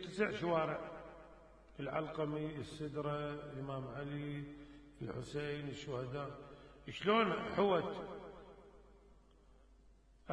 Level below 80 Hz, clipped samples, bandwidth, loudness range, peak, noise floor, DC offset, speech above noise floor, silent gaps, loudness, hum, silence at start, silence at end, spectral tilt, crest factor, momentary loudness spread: -64 dBFS; under 0.1%; 10.5 kHz; 6 LU; -20 dBFS; -65 dBFS; under 0.1%; 26 dB; none; -40 LUFS; none; 0 s; 0 s; -6.5 dB/octave; 22 dB; 22 LU